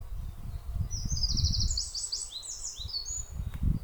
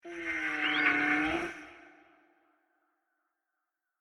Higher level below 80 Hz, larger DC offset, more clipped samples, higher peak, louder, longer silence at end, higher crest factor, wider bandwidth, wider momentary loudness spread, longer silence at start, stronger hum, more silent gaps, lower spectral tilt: first, -36 dBFS vs -64 dBFS; neither; neither; second, -16 dBFS vs -12 dBFS; second, -33 LUFS vs -29 LUFS; second, 0 s vs 2.15 s; second, 16 dB vs 24 dB; first, over 20 kHz vs 11 kHz; about the same, 13 LU vs 12 LU; about the same, 0 s vs 0.05 s; neither; neither; about the same, -3 dB/octave vs -3.5 dB/octave